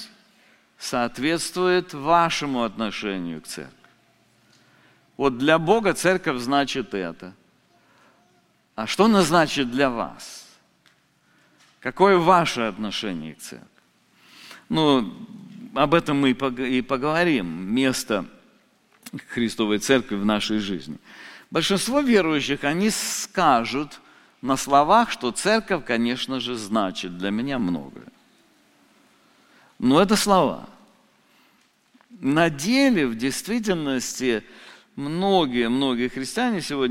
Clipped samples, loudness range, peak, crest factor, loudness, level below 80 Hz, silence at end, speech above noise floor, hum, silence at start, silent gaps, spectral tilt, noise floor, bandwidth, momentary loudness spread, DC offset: under 0.1%; 4 LU; -2 dBFS; 22 dB; -22 LUFS; -52 dBFS; 0 s; 40 dB; none; 0 s; none; -4.5 dB/octave; -62 dBFS; 16.5 kHz; 16 LU; under 0.1%